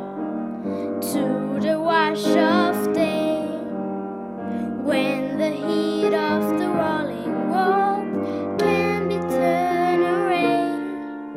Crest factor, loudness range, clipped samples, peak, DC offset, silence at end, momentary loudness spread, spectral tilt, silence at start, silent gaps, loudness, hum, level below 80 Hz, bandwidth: 16 dB; 3 LU; under 0.1%; -6 dBFS; under 0.1%; 0 s; 9 LU; -6 dB/octave; 0 s; none; -22 LUFS; none; -66 dBFS; 16 kHz